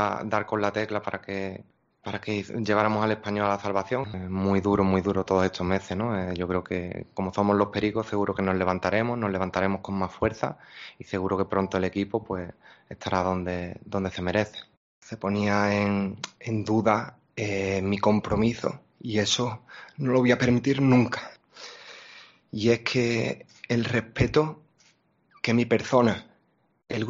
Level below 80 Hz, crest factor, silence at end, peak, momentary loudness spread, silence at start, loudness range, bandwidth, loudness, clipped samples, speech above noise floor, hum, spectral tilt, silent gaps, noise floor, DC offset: -54 dBFS; 20 dB; 0 s; -8 dBFS; 14 LU; 0 s; 4 LU; 7.6 kHz; -26 LUFS; under 0.1%; 42 dB; none; -5 dB/octave; 14.77-15.02 s; -67 dBFS; under 0.1%